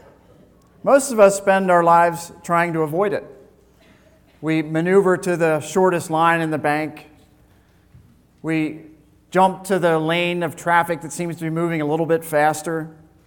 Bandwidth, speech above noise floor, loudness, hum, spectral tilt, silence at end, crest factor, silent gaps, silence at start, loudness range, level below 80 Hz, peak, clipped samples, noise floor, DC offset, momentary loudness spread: 19 kHz; 36 dB; -19 LUFS; none; -5.5 dB/octave; 0.35 s; 18 dB; none; 0.85 s; 6 LU; -60 dBFS; -2 dBFS; under 0.1%; -54 dBFS; under 0.1%; 12 LU